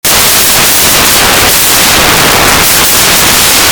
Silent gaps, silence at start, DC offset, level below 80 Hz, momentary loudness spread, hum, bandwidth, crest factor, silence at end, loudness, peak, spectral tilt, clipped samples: none; 0.05 s; under 0.1%; -26 dBFS; 1 LU; none; over 20 kHz; 6 dB; 0 s; -3 LUFS; 0 dBFS; -1 dB/octave; 3%